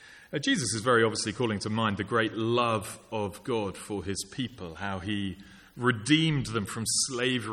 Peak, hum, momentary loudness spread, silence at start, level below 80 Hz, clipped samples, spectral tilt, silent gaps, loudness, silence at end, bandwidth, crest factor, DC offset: -10 dBFS; none; 12 LU; 0 s; -58 dBFS; under 0.1%; -4 dB/octave; none; -29 LUFS; 0 s; 14.5 kHz; 20 dB; under 0.1%